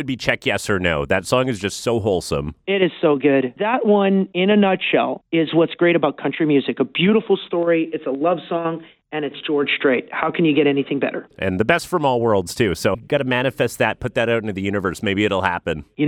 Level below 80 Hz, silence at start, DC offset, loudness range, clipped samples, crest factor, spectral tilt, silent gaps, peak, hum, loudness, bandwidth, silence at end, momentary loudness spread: -48 dBFS; 0 s; under 0.1%; 3 LU; under 0.1%; 18 dB; -5.5 dB/octave; none; -2 dBFS; none; -19 LUFS; 16.5 kHz; 0 s; 7 LU